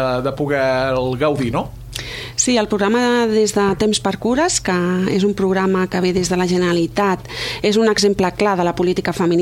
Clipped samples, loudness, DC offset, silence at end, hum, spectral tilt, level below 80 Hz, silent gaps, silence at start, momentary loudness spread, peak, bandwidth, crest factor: under 0.1%; -17 LUFS; under 0.1%; 0 s; none; -4.5 dB/octave; -42 dBFS; none; 0 s; 5 LU; -2 dBFS; 16 kHz; 14 dB